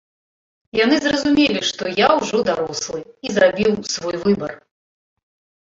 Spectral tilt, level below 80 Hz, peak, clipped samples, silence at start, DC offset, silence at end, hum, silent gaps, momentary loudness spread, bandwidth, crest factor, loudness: -4 dB/octave; -54 dBFS; -2 dBFS; under 0.1%; 0.75 s; under 0.1%; 1.15 s; none; none; 9 LU; 7.8 kHz; 18 dB; -18 LUFS